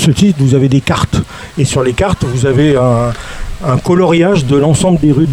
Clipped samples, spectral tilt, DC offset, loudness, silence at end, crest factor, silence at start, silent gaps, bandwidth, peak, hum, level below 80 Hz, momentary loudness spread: under 0.1%; -6.5 dB/octave; under 0.1%; -11 LUFS; 0 s; 10 dB; 0 s; none; 13.5 kHz; 0 dBFS; none; -28 dBFS; 8 LU